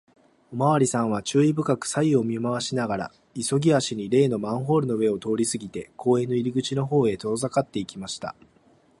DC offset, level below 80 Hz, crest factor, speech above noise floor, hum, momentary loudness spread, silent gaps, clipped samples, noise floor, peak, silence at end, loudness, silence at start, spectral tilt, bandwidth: under 0.1%; -60 dBFS; 18 dB; 36 dB; none; 11 LU; none; under 0.1%; -59 dBFS; -8 dBFS; 0.7 s; -24 LUFS; 0.5 s; -5.5 dB/octave; 11.5 kHz